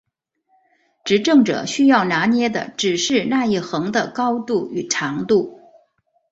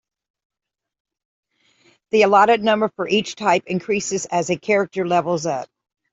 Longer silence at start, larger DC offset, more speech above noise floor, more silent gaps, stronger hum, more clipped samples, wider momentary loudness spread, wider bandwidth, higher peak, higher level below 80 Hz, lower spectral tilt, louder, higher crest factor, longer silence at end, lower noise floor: second, 1.05 s vs 2.15 s; neither; first, 50 dB vs 40 dB; neither; neither; neither; about the same, 7 LU vs 9 LU; about the same, 8 kHz vs 8 kHz; about the same, -2 dBFS vs -2 dBFS; about the same, -60 dBFS vs -64 dBFS; about the same, -4 dB/octave vs -4 dB/octave; about the same, -18 LUFS vs -19 LUFS; about the same, 16 dB vs 18 dB; first, 0.8 s vs 0.45 s; first, -68 dBFS vs -59 dBFS